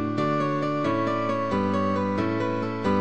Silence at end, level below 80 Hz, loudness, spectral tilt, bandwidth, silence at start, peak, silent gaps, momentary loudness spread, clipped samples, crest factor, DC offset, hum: 0 s; -54 dBFS; -25 LUFS; -7.5 dB/octave; 8.8 kHz; 0 s; -12 dBFS; none; 2 LU; under 0.1%; 14 dB; 0.6%; none